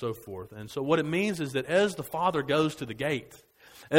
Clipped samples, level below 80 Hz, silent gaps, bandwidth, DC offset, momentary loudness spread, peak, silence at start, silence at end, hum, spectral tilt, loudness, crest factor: under 0.1%; -64 dBFS; none; 16 kHz; under 0.1%; 12 LU; -6 dBFS; 0 s; 0 s; none; -5.5 dB/octave; -29 LUFS; 22 dB